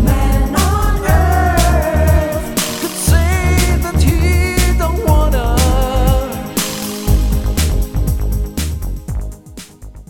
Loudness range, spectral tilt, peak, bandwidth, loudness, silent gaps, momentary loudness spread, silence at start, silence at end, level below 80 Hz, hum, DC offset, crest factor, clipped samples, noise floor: 5 LU; -5 dB/octave; 0 dBFS; 18.5 kHz; -15 LUFS; none; 10 LU; 0 s; 0.05 s; -16 dBFS; none; under 0.1%; 14 dB; under 0.1%; -35 dBFS